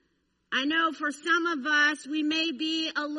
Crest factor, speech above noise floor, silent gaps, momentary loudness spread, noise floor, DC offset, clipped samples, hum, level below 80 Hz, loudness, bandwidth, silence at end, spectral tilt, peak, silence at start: 18 dB; 46 dB; none; 6 LU; -73 dBFS; under 0.1%; under 0.1%; none; -78 dBFS; -26 LUFS; 11.5 kHz; 0 s; -1 dB/octave; -10 dBFS; 0.5 s